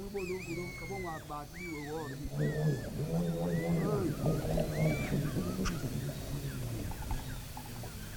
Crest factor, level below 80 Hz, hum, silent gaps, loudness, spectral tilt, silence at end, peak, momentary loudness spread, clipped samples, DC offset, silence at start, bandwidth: 16 dB; -46 dBFS; none; none; -36 LUFS; -6.5 dB/octave; 0 s; -18 dBFS; 10 LU; under 0.1%; under 0.1%; 0 s; 19.5 kHz